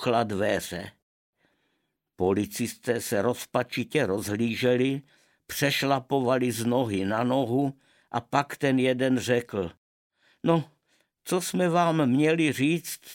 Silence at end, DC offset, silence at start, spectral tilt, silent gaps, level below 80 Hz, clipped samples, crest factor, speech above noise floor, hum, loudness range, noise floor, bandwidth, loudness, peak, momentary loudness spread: 0 s; under 0.1%; 0 s; -5.5 dB/octave; 1.02-1.33 s, 9.77-10.10 s; -64 dBFS; under 0.1%; 20 dB; 51 dB; none; 4 LU; -77 dBFS; 17 kHz; -26 LUFS; -8 dBFS; 10 LU